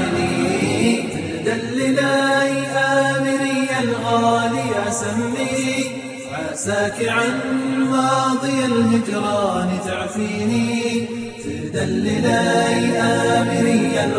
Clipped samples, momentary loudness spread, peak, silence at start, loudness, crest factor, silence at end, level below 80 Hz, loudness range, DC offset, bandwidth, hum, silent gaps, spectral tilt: under 0.1%; 7 LU; -4 dBFS; 0 s; -19 LUFS; 16 dB; 0 s; -52 dBFS; 3 LU; under 0.1%; 10.5 kHz; none; none; -4.5 dB/octave